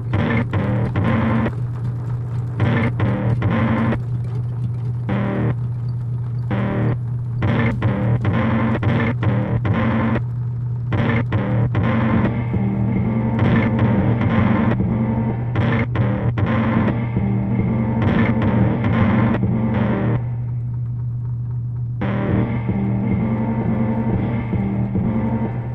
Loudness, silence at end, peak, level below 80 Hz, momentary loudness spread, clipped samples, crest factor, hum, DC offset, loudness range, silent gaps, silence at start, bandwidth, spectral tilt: -20 LUFS; 0 s; -4 dBFS; -36 dBFS; 7 LU; under 0.1%; 14 dB; none; under 0.1%; 4 LU; none; 0 s; 4.2 kHz; -10 dB/octave